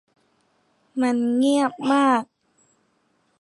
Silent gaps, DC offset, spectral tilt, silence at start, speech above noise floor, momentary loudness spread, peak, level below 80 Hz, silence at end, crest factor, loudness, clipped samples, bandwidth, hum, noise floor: none; under 0.1%; -4 dB/octave; 0.95 s; 47 dB; 10 LU; -6 dBFS; -80 dBFS; 1.2 s; 16 dB; -21 LUFS; under 0.1%; 11.5 kHz; none; -67 dBFS